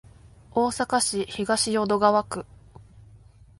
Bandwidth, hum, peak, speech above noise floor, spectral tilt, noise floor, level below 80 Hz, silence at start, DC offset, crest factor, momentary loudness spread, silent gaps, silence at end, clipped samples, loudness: 11.5 kHz; none; -6 dBFS; 28 dB; -3 dB/octave; -51 dBFS; -54 dBFS; 0.25 s; under 0.1%; 20 dB; 13 LU; none; 0.45 s; under 0.1%; -24 LUFS